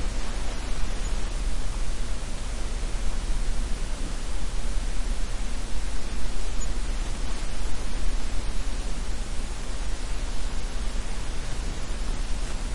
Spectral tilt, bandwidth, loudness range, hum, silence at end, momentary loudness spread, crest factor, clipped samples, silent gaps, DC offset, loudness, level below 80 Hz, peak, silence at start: -4 dB/octave; 11.5 kHz; 1 LU; none; 0 s; 2 LU; 12 dB; under 0.1%; none; under 0.1%; -34 LUFS; -28 dBFS; -10 dBFS; 0 s